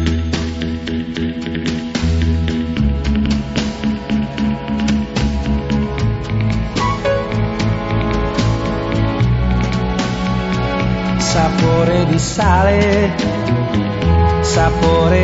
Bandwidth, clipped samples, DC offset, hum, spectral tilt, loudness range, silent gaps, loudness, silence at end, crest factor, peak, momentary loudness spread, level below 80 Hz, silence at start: 8 kHz; under 0.1%; under 0.1%; none; -6 dB/octave; 4 LU; none; -17 LUFS; 0 s; 16 dB; 0 dBFS; 7 LU; -24 dBFS; 0 s